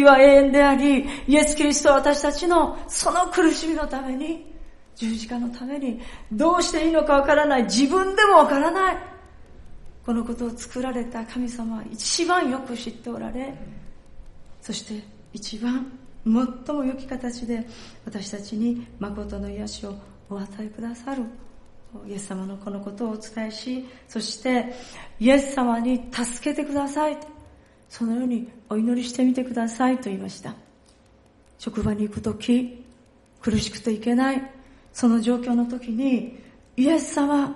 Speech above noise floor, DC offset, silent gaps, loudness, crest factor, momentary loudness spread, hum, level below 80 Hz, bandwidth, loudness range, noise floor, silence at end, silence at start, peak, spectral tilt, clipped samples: 33 dB; under 0.1%; none; -23 LUFS; 22 dB; 17 LU; none; -44 dBFS; 11.5 kHz; 13 LU; -55 dBFS; 0 s; 0 s; -2 dBFS; -4 dB/octave; under 0.1%